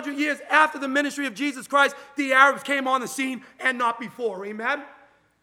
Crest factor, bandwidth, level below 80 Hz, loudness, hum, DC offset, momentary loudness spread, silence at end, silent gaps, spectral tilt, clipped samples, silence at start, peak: 22 dB; 16.5 kHz; -80 dBFS; -23 LUFS; none; under 0.1%; 12 LU; 0.5 s; none; -2.5 dB/octave; under 0.1%; 0 s; -2 dBFS